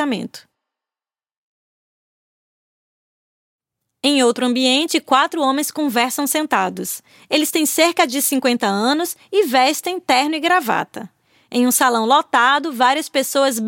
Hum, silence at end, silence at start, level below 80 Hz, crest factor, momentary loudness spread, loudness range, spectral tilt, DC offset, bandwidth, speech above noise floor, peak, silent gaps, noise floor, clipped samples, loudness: none; 0 s; 0 s; -72 dBFS; 18 dB; 8 LU; 4 LU; -2 dB/octave; under 0.1%; 17 kHz; over 73 dB; 0 dBFS; 1.37-3.59 s; under -90 dBFS; under 0.1%; -17 LUFS